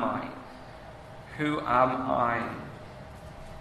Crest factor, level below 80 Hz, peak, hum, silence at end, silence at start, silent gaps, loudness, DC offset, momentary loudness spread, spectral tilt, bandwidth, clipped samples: 22 dB; -54 dBFS; -10 dBFS; none; 0 s; 0 s; none; -28 LUFS; under 0.1%; 21 LU; -7 dB/octave; 13.5 kHz; under 0.1%